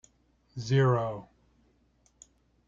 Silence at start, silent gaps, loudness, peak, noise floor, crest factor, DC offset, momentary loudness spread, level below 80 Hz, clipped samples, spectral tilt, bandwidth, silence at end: 0.55 s; none; -28 LUFS; -14 dBFS; -68 dBFS; 18 dB; under 0.1%; 19 LU; -64 dBFS; under 0.1%; -7 dB/octave; 7.4 kHz; 1.45 s